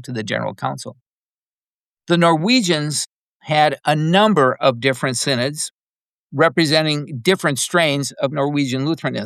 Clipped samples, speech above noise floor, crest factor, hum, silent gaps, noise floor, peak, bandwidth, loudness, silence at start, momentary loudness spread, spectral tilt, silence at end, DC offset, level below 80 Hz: under 0.1%; over 72 dB; 16 dB; none; 1.02-1.97 s, 3.11-3.40 s, 5.71-6.28 s; under -90 dBFS; -2 dBFS; 14.5 kHz; -18 LUFS; 0 s; 11 LU; -4.5 dB/octave; 0 s; under 0.1%; -70 dBFS